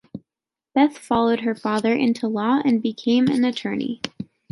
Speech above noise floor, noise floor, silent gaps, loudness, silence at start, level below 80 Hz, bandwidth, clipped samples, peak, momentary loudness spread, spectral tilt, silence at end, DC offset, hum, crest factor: 69 dB; -89 dBFS; none; -21 LUFS; 0.15 s; -60 dBFS; 11.5 kHz; under 0.1%; -4 dBFS; 12 LU; -6 dB/octave; 0.25 s; under 0.1%; none; 18 dB